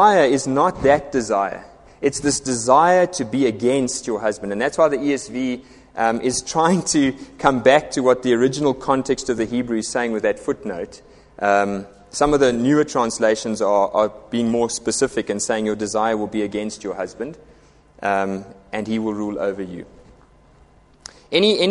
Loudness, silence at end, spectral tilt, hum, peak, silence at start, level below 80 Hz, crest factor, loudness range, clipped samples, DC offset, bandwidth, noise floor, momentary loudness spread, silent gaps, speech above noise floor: -20 LUFS; 0 s; -4 dB/octave; none; 0 dBFS; 0 s; -50 dBFS; 20 dB; 8 LU; under 0.1%; under 0.1%; 11.5 kHz; -51 dBFS; 11 LU; none; 32 dB